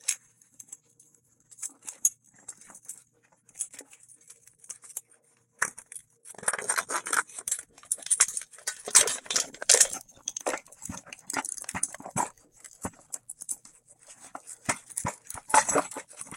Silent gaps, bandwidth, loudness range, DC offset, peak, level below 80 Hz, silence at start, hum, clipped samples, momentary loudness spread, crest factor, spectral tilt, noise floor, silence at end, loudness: none; 16.5 kHz; 14 LU; under 0.1%; -2 dBFS; -66 dBFS; 0.05 s; none; under 0.1%; 24 LU; 30 dB; 0 dB/octave; -65 dBFS; 0 s; -27 LUFS